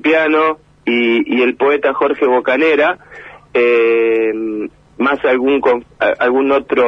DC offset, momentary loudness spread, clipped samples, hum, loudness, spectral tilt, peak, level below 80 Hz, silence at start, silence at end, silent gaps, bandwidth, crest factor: under 0.1%; 8 LU; under 0.1%; none; -14 LUFS; -6 dB/octave; -2 dBFS; -52 dBFS; 0.05 s; 0 s; none; 6.2 kHz; 12 dB